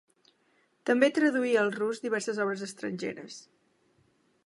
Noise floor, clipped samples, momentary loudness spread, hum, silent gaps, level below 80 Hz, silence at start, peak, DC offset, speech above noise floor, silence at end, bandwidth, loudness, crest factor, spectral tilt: -69 dBFS; under 0.1%; 14 LU; none; none; -84 dBFS; 0.85 s; -10 dBFS; under 0.1%; 41 dB; 1.05 s; 11.5 kHz; -29 LUFS; 20 dB; -4.5 dB/octave